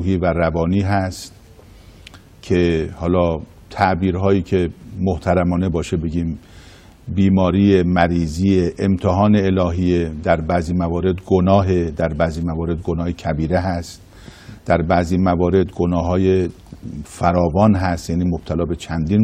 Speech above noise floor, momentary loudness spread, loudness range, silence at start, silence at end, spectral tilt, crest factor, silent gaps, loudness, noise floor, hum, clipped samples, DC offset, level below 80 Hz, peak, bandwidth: 26 dB; 10 LU; 4 LU; 0 s; 0 s; -7.5 dB/octave; 18 dB; none; -18 LUFS; -43 dBFS; none; under 0.1%; under 0.1%; -36 dBFS; 0 dBFS; 11.5 kHz